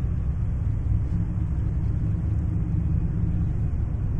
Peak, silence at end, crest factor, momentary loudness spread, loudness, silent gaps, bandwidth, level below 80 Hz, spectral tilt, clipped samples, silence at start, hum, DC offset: -12 dBFS; 0 s; 12 dB; 2 LU; -27 LUFS; none; 3.2 kHz; -28 dBFS; -11 dB/octave; under 0.1%; 0 s; none; under 0.1%